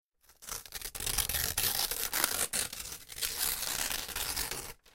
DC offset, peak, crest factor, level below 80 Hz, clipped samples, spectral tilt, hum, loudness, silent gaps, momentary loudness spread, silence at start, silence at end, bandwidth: under 0.1%; -8 dBFS; 28 dB; -50 dBFS; under 0.1%; 0 dB/octave; none; -32 LUFS; none; 12 LU; 0.3 s; 0.05 s; 17 kHz